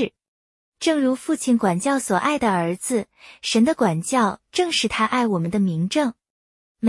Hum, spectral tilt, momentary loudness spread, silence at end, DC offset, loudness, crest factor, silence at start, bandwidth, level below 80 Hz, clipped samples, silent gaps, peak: none; -4.5 dB/octave; 6 LU; 0 s; under 0.1%; -21 LUFS; 16 dB; 0 s; 12 kHz; -58 dBFS; under 0.1%; 0.28-0.72 s, 6.30-6.75 s; -6 dBFS